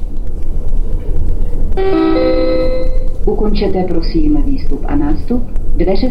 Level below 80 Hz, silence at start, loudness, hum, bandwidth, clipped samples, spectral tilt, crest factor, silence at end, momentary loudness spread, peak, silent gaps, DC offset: -14 dBFS; 0 s; -17 LUFS; none; 5.4 kHz; under 0.1%; -8.5 dB/octave; 8 dB; 0 s; 9 LU; -2 dBFS; none; under 0.1%